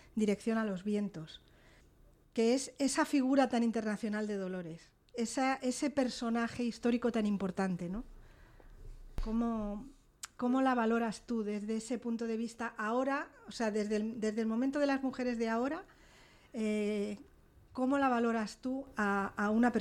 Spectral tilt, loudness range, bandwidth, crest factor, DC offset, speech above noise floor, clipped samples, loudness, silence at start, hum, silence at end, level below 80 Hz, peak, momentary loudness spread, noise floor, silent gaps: -5 dB/octave; 3 LU; 14 kHz; 18 dB; under 0.1%; 30 dB; under 0.1%; -34 LUFS; 0.15 s; none; 0 s; -56 dBFS; -16 dBFS; 13 LU; -63 dBFS; none